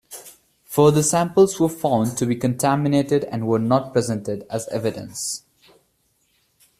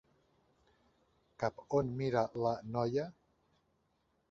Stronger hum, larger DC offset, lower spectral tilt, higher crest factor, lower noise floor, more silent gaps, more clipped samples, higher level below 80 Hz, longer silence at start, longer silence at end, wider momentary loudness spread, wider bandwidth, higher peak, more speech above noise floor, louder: neither; neither; about the same, -5.5 dB/octave vs -6.5 dB/octave; about the same, 18 dB vs 22 dB; second, -66 dBFS vs -78 dBFS; neither; neither; first, -58 dBFS vs -68 dBFS; second, 0.1 s vs 1.4 s; first, 1.4 s vs 1.2 s; first, 11 LU vs 6 LU; first, 15.5 kHz vs 7.6 kHz; first, -2 dBFS vs -18 dBFS; about the same, 46 dB vs 43 dB; first, -20 LUFS vs -36 LUFS